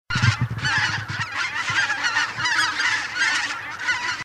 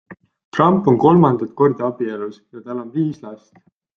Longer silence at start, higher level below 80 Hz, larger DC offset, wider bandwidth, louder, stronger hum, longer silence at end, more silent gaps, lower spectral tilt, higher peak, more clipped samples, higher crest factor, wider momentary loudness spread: about the same, 0.1 s vs 0.1 s; first, -50 dBFS vs -58 dBFS; neither; first, 13.5 kHz vs 6.8 kHz; second, -22 LUFS vs -17 LUFS; neither; second, 0 s vs 0.6 s; second, none vs 0.44-0.52 s; second, -2.5 dB/octave vs -9.5 dB/octave; second, -6 dBFS vs -2 dBFS; neither; about the same, 18 dB vs 18 dB; second, 5 LU vs 18 LU